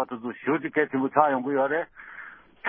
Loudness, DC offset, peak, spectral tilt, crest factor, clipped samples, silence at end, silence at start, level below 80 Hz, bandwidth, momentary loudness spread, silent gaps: -25 LUFS; under 0.1%; -4 dBFS; -10.5 dB/octave; 22 dB; under 0.1%; 0 s; 0 s; -72 dBFS; 3.6 kHz; 19 LU; none